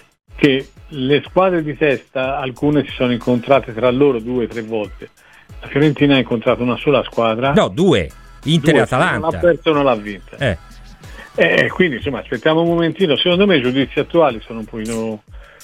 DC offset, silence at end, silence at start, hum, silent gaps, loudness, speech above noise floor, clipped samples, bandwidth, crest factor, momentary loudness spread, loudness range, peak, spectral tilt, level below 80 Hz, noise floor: under 0.1%; 0.2 s; 0.35 s; none; none; -16 LUFS; 21 dB; under 0.1%; 14 kHz; 16 dB; 11 LU; 2 LU; 0 dBFS; -6.5 dB/octave; -42 dBFS; -37 dBFS